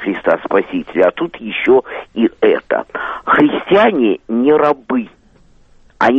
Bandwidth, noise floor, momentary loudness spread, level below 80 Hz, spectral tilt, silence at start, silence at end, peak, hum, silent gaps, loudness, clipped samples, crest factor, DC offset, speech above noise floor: 7 kHz; -48 dBFS; 9 LU; -50 dBFS; -7 dB/octave; 0 s; 0 s; 0 dBFS; none; none; -14 LUFS; under 0.1%; 14 dB; under 0.1%; 34 dB